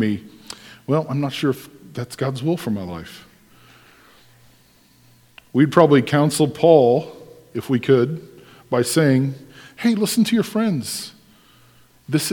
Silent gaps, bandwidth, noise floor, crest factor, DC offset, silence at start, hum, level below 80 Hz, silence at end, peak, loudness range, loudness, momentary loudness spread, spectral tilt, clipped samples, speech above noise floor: none; 19 kHz; -54 dBFS; 20 dB; under 0.1%; 0 s; none; -60 dBFS; 0 s; 0 dBFS; 12 LU; -19 LUFS; 21 LU; -6 dB/octave; under 0.1%; 36 dB